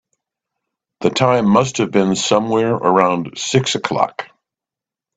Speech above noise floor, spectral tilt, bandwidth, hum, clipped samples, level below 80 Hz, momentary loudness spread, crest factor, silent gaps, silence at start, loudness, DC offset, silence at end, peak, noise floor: 72 dB; -5 dB/octave; 9.2 kHz; none; under 0.1%; -56 dBFS; 7 LU; 18 dB; none; 1 s; -16 LUFS; under 0.1%; 0.9 s; 0 dBFS; -87 dBFS